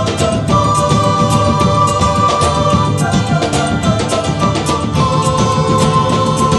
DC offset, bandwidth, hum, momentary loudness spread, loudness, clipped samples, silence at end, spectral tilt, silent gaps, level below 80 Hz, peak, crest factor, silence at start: under 0.1%; 12.5 kHz; none; 3 LU; -13 LUFS; under 0.1%; 0 s; -5.5 dB/octave; none; -30 dBFS; 0 dBFS; 12 dB; 0 s